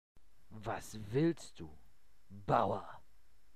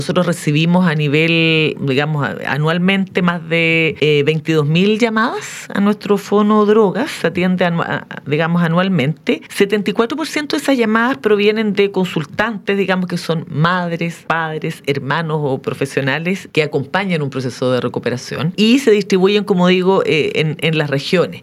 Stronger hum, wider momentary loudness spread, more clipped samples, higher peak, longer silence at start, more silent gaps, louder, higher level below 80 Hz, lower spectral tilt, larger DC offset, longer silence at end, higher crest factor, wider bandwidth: neither; first, 21 LU vs 8 LU; neither; second, -16 dBFS vs 0 dBFS; first, 0.5 s vs 0 s; neither; second, -37 LUFS vs -16 LUFS; about the same, -62 dBFS vs -58 dBFS; about the same, -6.5 dB/octave vs -6 dB/octave; first, 0.3% vs under 0.1%; first, 0.6 s vs 0 s; first, 24 dB vs 16 dB; about the same, 14.5 kHz vs 14.5 kHz